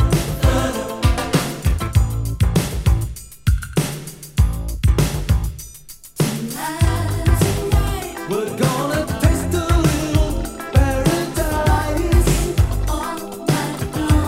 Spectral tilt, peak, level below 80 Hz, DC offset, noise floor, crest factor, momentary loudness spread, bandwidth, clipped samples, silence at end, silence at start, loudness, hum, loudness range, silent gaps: -5.5 dB/octave; 0 dBFS; -22 dBFS; under 0.1%; -39 dBFS; 18 dB; 7 LU; 16.5 kHz; under 0.1%; 0 s; 0 s; -20 LUFS; none; 3 LU; none